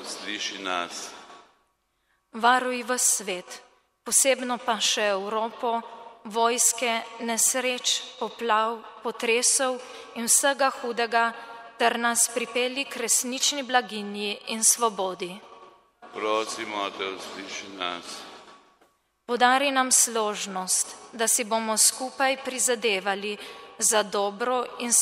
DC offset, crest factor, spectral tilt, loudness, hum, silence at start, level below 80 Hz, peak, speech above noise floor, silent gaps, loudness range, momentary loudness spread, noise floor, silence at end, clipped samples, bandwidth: under 0.1%; 22 dB; -0.5 dB/octave; -24 LUFS; none; 0 s; -76 dBFS; -4 dBFS; 46 dB; none; 5 LU; 16 LU; -72 dBFS; 0 s; under 0.1%; 16 kHz